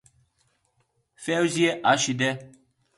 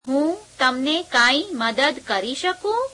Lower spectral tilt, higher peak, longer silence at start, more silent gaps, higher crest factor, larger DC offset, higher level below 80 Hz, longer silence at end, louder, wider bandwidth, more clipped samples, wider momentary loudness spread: first, -3.5 dB/octave vs -2 dB/octave; about the same, -6 dBFS vs -6 dBFS; first, 1.2 s vs 0.05 s; neither; about the same, 20 dB vs 16 dB; neither; second, -70 dBFS vs -60 dBFS; first, 0.5 s vs 0 s; second, -23 LUFS vs -20 LUFS; about the same, 11.5 kHz vs 11.5 kHz; neither; first, 12 LU vs 8 LU